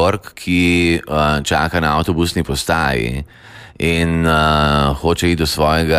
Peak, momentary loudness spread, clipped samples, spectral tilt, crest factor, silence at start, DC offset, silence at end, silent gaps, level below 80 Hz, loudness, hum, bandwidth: -2 dBFS; 7 LU; under 0.1%; -5 dB/octave; 12 dB; 0 s; under 0.1%; 0 s; none; -28 dBFS; -16 LUFS; none; 15.5 kHz